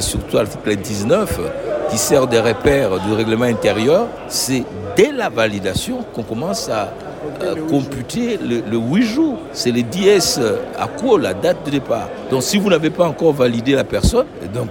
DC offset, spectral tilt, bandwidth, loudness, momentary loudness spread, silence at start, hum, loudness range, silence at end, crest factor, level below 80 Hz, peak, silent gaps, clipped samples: under 0.1%; -4.5 dB/octave; 17 kHz; -17 LUFS; 8 LU; 0 s; none; 4 LU; 0 s; 16 dB; -36 dBFS; 0 dBFS; none; under 0.1%